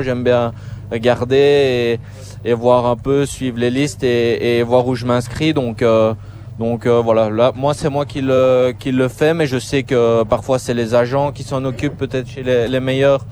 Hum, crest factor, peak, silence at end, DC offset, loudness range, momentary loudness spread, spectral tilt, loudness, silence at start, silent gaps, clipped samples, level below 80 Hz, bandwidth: none; 16 dB; 0 dBFS; 0 s; under 0.1%; 2 LU; 8 LU; -6.5 dB/octave; -16 LUFS; 0 s; none; under 0.1%; -42 dBFS; over 20 kHz